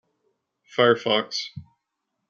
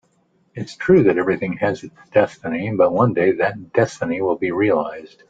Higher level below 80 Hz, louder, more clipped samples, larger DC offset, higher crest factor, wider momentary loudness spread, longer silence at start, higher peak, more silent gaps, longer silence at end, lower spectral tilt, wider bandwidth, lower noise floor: second, -70 dBFS vs -56 dBFS; second, -22 LUFS vs -19 LUFS; neither; neither; first, 22 dB vs 16 dB; about the same, 13 LU vs 12 LU; first, 0.75 s vs 0.55 s; about the same, -4 dBFS vs -2 dBFS; neither; first, 0.7 s vs 0.25 s; second, -4 dB/octave vs -7.5 dB/octave; about the same, 7.4 kHz vs 7.8 kHz; first, -80 dBFS vs -62 dBFS